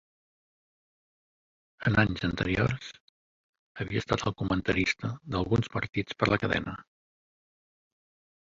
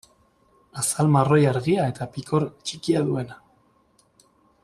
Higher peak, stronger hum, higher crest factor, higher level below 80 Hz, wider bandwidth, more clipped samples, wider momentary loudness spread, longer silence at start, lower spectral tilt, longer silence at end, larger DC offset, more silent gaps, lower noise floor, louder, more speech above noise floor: second, -10 dBFS vs -6 dBFS; neither; about the same, 22 dB vs 18 dB; first, -50 dBFS vs -58 dBFS; second, 7.6 kHz vs 13.5 kHz; neither; about the same, 10 LU vs 12 LU; first, 1.8 s vs 0.75 s; about the same, -6 dB/octave vs -6 dB/octave; first, 1.65 s vs 1.3 s; neither; first, 3.00-3.75 s vs none; first, under -90 dBFS vs -62 dBFS; second, -29 LUFS vs -23 LUFS; first, over 61 dB vs 40 dB